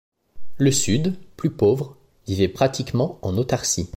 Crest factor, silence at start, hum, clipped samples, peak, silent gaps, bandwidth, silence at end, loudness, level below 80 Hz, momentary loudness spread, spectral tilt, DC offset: 16 dB; 0.35 s; none; under 0.1%; -6 dBFS; none; 16.5 kHz; 0.1 s; -22 LUFS; -48 dBFS; 8 LU; -5 dB/octave; under 0.1%